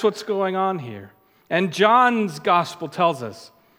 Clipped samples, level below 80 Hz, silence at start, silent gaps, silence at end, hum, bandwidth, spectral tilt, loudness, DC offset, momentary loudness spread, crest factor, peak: under 0.1%; -76 dBFS; 0 s; none; 0.3 s; none; 16.5 kHz; -5 dB/octave; -20 LUFS; under 0.1%; 16 LU; 20 dB; -2 dBFS